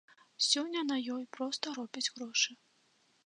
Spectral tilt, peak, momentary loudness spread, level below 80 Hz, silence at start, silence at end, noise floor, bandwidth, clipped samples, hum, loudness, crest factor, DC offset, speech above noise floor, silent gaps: 0 dB/octave; -14 dBFS; 9 LU; under -90 dBFS; 0.4 s; 0.7 s; -71 dBFS; 11 kHz; under 0.1%; none; -34 LUFS; 22 dB; under 0.1%; 36 dB; none